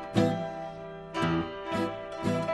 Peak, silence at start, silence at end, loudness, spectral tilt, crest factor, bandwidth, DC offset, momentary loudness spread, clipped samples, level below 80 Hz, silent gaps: -10 dBFS; 0 s; 0 s; -31 LUFS; -6.5 dB/octave; 20 dB; 12.5 kHz; under 0.1%; 11 LU; under 0.1%; -56 dBFS; none